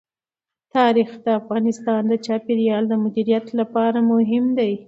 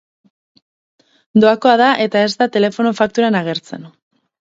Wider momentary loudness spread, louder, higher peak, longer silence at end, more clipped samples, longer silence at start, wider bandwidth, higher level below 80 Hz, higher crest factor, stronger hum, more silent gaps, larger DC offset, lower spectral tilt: second, 5 LU vs 12 LU; second, -20 LUFS vs -14 LUFS; second, -4 dBFS vs 0 dBFS; second, 0.05 s vs 0.55 s; neither; second, 0.75 s vs 1.35 s; about the same, 7.8 kHz vs 7.8 kHz; second, -70 dBFS vs -62 dBFS; about the same, 16 dB vs 16 dB; neither; neither; neither; first, -7 dB/octave vs -5.5 dB/octave